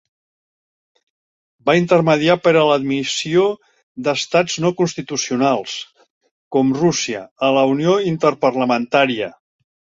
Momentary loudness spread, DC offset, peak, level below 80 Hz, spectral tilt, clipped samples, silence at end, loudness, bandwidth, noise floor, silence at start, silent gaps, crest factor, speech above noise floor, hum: 10 LU; under 0.1%; -2 dBFS; -60 dBFS; -4.5 dB/octave; under 0.1%; 0.65 s; -17 LUFS; 8 kHz; under -90 dBFS; 1.65 s; 3.83-3.95 s, 6.10-6.21 s, 6.31-6.51 s, 7.31-7.36 s; 16 dB; over 73 dB; none